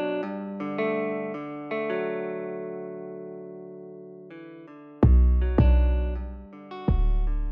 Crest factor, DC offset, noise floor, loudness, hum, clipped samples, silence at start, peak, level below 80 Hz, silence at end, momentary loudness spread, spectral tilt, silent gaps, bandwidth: 16 dB; under 0.1%; -45 dBFS; -26 LUFS; none; under 0.1%; 0 s; -10 dBFS; -26 dBFS; 0 s; 22 LU; -11 dB/octave; none; 4.1 kHz